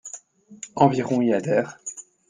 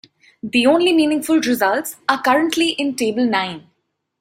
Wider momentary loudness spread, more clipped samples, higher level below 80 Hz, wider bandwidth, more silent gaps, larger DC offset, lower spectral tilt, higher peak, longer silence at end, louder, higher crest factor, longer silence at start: first, 19 LU vs 7 LU; neither; about the same, -62 dBFS vs -64 dBFS; second, 9.8 kHz vs 16 kHz; neither; neither; first, -6 dB/octave vs -3.5 dB/octave; about the same, -2 dBFS vs -2 dBFS; second, 0.3 s vs 0.6 s; second, -22 LUFS vs -17 LUFS; first, 22 dB vs 16 dB; second, 0.05 s vs 0.45 s